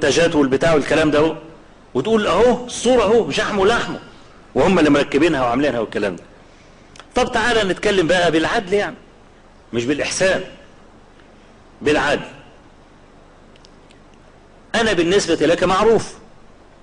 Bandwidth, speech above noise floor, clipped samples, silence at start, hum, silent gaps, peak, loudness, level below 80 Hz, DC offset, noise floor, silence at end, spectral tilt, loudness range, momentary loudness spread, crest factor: 10.5 kHz; 30 dB; under 0.1%; 0 s; none; none; -4 dBFS; -17 LUFS; -42 dBFS; under 0.1%; -46 dBFS; 0.65 s; -4.5 dB/octave; 8 LU; 10 LU; 14 dB